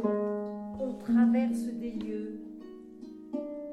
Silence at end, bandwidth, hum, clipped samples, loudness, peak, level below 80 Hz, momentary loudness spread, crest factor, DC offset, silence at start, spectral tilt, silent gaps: 0 s; 11.5 kHz; none; under 0.1%; -31 LUFS; -16 dBFS; -64 dBFS; 21 LU; 16 dB; under 0.1%; 0 s; -7.5 dB/octave; none